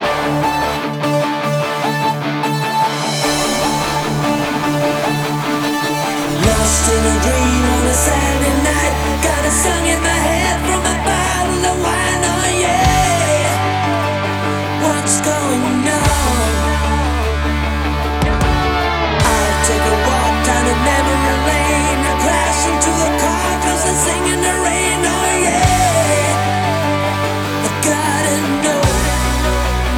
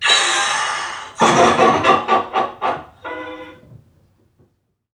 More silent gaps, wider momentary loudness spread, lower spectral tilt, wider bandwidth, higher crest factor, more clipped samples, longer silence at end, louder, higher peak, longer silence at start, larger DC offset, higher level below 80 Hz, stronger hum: neither; second, 4 LU vs 18 LU; first, -4 dB/octave vs -2.5 dB/octave; first, over 20 kHz vs 13.5 kHz; about the same, 14 dB vs 18 dB; neither; second, 0 s vs 1.25 s; about the same, -15 LUFS vs -16 LUFS; about the same, -2 dBFS vs 0 dBFS; about the same, 0 s vs 0 s; neither; first, -24 dBFS vs -56 dBFS; neither